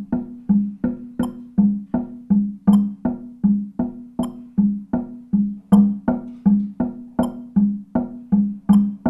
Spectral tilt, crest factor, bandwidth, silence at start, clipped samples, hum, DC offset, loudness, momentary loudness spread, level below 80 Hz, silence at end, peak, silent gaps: -9.5 dB/octave; 18 dB; 10 kHz; 0 s; under 0.1%; none; under 0.1%; -21 LUFS; 10 LU; -46 dBFS; 0 s; -2 dBFS; none